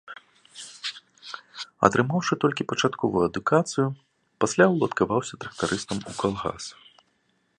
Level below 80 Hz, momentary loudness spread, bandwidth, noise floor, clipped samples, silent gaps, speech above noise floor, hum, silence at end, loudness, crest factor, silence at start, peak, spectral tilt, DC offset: -58 dBFS; 19 LU; 11.5 kHz; -69 dBFS; under 0.1%; none; 45 dB; none; 0.85 s; -25 LUFS; 26 dB; 0.05 s; 0 dBFS; -5 dB/octave; under 0.1%